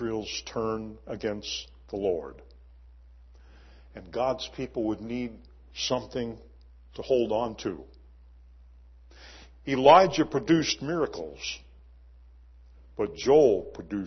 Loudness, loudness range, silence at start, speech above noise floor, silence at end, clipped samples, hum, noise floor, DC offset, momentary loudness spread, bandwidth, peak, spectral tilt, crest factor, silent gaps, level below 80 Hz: -27 LUFS; 10 LU; 0 s; 26 dB; 0 s; under 0.1%; none; -52 dBFS; under 0.1%; 21 LU; 6.4 kHz; -4 dBFS; -5 dB/octave; 24 dB; none; -52 dBFS